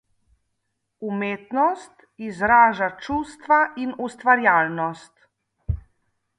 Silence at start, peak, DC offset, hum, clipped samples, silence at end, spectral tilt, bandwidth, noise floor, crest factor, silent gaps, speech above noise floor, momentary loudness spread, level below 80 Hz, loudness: 1 s; -4 dBFS; under 0.1%; none; under 0.1%; 0.6 s; -6.5 dB/octave; 10.5 kHz; -76 dBFS; 20 dB; none; 55 dB; 19 LU; -44 dBFS; -21 LUFS